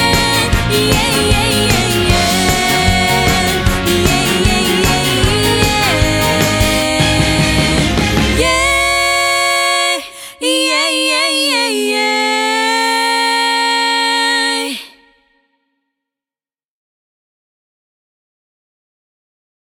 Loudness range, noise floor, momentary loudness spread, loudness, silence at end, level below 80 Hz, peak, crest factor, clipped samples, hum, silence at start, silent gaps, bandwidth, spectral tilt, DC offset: 3 LU; under -90 dBFS; 2 LU; -12 LUFS; 4.8 s; -26 dBFS; 0 dBFS; 14 dB; under 0.1%; none; 0 s; none; 19.5 kHz; -3.5 dB/octave; under 0.1%